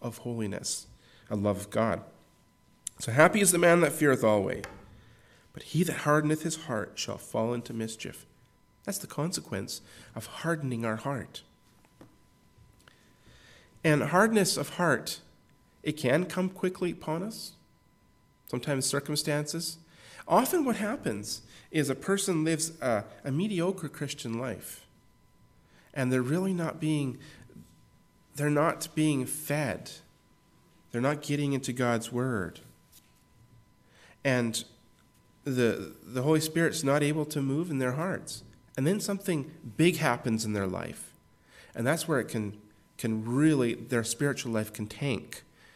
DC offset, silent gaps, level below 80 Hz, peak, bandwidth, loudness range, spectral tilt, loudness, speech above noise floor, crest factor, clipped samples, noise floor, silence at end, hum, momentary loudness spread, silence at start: under 0.1%; none; -66 dBFS; -6 dBFS; 16 kHz; 9 LU; -5 dB/octave; -29 LUFS; 35 dB; 24 dB; under 0.1%; -64 dBFS; 0.35 s; none; 16 LU; 0 s